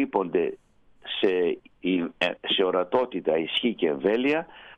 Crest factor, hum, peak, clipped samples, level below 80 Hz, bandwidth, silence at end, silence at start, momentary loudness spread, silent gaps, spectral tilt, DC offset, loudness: 16 dB; none; -10 dBFS; under 0.1%; -66 dBFS; 9 kHz; 0.05 s; 0 s; 6 LU; none; -6 dB/octave; under 0.1%; -26 LUFS